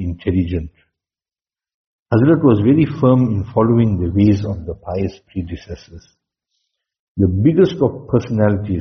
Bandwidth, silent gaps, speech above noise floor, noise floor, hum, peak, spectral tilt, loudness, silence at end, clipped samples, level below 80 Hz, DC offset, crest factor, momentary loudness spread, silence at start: 6.4 kHz; 1.74-2.06 s, 6.99-7.15 s; over 75 dB; under -90 dBFS; none; -2 dBFS; -9 dB/octave; -16 LUFS; 0 s; under 0.1%; -42 dBFS; under 0.1%; 16 dB; 15 LU; 0 s